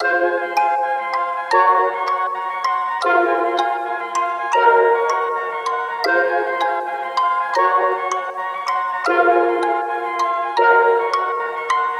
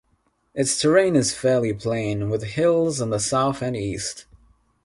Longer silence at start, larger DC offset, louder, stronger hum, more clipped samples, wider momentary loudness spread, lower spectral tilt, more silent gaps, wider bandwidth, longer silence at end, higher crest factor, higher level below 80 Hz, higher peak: second, 0 s vs 0.55 s; neither; first, -18 LUFS vs -22 LUFS; neither; neither; about the same, 8 LU vs 10 LU; second, -2 dB/octave vs -4.5 dB/octave; neither; first, 14.5 kHz vs 11.5 kHz; second, 0 s vs 0.6 s; about the same, 16 dB vs 18 dB; second, -70 dBFS vs -52 dBFS; about the same, -2 dBFS vs -4 dBFS